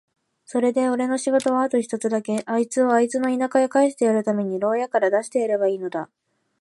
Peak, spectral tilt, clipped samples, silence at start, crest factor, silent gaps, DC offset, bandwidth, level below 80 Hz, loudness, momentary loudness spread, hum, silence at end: -6 dBFS; -5 dB/octave; under 0.1%; 0.5 s; 16 dB; none; under 0.1%; 11.5 kHz; -74 dBFS; -22 LUFS; 5 LU; none; 0.55 s